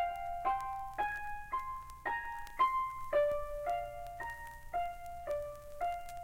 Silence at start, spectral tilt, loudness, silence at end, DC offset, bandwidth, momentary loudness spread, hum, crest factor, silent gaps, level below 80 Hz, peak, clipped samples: 0 s; -4 dB/octave; -38 LUFS; 0 s; under 0.1%; 17 kHz; 11 LU; none; 16 dB; none; -54 dBFS; -20 dBFS; under 0.1%